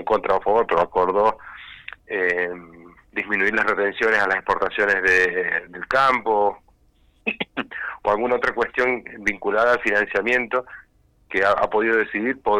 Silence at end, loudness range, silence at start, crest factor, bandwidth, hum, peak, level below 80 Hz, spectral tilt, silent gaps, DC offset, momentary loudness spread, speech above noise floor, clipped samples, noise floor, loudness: 0 s; 3 LU; 0 s; 14 dB; 11.5 kHz; none; -8 dBFS; -52 dBFS; -4.5 dB/octave; none; under 0.1%; 11 LU; 38 dB; under 0.1%; -59 dBFS; -21 LUFS